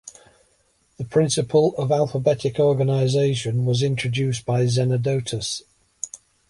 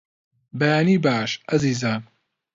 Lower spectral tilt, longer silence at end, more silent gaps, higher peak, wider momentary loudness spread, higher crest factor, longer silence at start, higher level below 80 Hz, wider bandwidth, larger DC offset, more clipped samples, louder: about the same, -5.5 dB/octave vs -6 dB/octave; second, 0.35 s vs 0.5 s; neither; about the same, -6 dBFS vs -6 dBFS; first, 12 LU vs 9 LU; about the same, 16 dB vs 16 dB; second, 0.05 s vs 0.55 s; about the same, -56 dBFS vs -58 dBFS; first, 11.5 kHz vs 7.8 kHz; neither; neither; about the same, -21 LUFS vs -21 LUFS